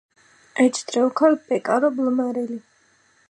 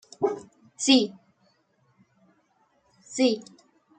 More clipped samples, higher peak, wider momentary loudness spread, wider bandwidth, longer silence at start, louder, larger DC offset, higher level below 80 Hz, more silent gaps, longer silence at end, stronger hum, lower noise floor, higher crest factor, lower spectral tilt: neither; first, -4 dBFS vs -8 dBFS; second, 12 LU vs 15 LU; about the same, 9.4 kHz vs 9.4 kHz; first, 0.55 s vs 0.2 s; first, -21 LUFS vs -25 LUFS; neither; about the same, -78 dBFS vs -78 dBFS; neither; first, 0.7 s vs 0.55 s; neither; second, -60 dBFS vs -67 dBFS; about the same, 18 dB vs 22 dB; first, -4 dB/octave vs -2.5 dB/octave